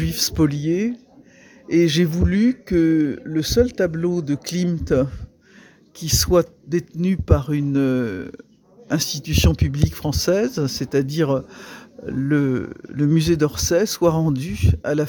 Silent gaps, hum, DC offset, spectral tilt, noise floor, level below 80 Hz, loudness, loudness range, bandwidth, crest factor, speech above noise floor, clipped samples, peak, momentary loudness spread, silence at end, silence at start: none; none; under 0.1%; -5.5 dB/octave; -49 dBFS; -34 dBFS; -20 LUFS; 2 LU; 19 kHz; 20 dB; 30 dB; under 0.1%; 0 dBFS; 9 LU; 0 s; 0 s